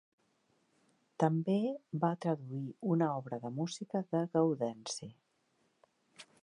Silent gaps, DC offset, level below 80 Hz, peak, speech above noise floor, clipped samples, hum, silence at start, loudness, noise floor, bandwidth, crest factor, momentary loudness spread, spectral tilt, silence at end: none; under 0.1%; -82 dBFS; -16 dBFS; 42 dB; under 0.1%; none; 1.2 s; -35 LUFS; -76 dBFS; 10.5 kHz; 22 dB; 10 LU; -6.5 dB/octave; 0.2 s